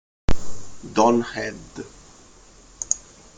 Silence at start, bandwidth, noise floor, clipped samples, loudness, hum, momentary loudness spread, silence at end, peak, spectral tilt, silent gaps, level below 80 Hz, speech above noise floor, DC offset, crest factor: 0.3 s; 9.6 kHz; -49 dBFS; under 0.1%; -24 LUFS; none; 22 LU; 0.4 s; -2 dBFS; -4 dB/octave; none; -38 dBFS; 27 dB; under 0.1%; 20 dB